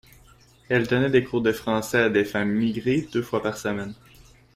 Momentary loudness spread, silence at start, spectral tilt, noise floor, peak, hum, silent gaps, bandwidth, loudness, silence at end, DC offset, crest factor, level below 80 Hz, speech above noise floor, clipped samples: 8 LU; 0.7 s; -6 dB/octave; -54 dBFS; -6 dBFS; none; none; 16 kHz; -24 LUFS; 0.6 s; under 0.1%; 18 dB; -54 dBFS; 31 dB; under 0.1%